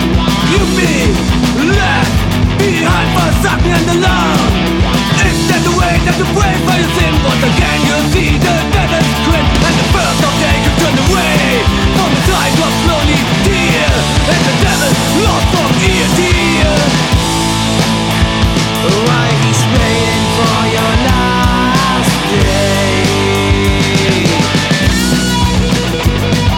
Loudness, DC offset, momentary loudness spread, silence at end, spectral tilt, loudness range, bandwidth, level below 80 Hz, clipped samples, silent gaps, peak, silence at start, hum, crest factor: -11 LUFS; under 0.1%; 2 LU; 0 s; -4.5 dB/octave; 1 LU; 18.5 kHz; -20 dBFS; under 0.1%; none; 0 dBFS; 0 s; none; 10 dB